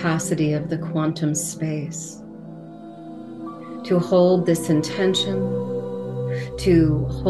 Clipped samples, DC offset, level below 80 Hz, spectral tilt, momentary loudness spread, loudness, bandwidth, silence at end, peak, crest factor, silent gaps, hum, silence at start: under 0.1%; 0.1%; -42 dBFS; -5.5 dB/octave; 21 LU; -22 LUFS; 12.5 kHz; 0 s; -6 dBFS; 16 dB; none; none; 0 s